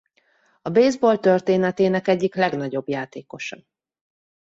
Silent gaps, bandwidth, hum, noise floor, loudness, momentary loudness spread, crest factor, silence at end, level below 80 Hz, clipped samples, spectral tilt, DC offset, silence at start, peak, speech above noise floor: none; 8 kHz; none; -63 dBFS; -20 LUFS; 15 LU; 18 dB; 1 s; -66 dBFS; under 0.1%; -6.5 dB/octave; under 0.1%; 0.65 s; -4 dBFS; 43 dB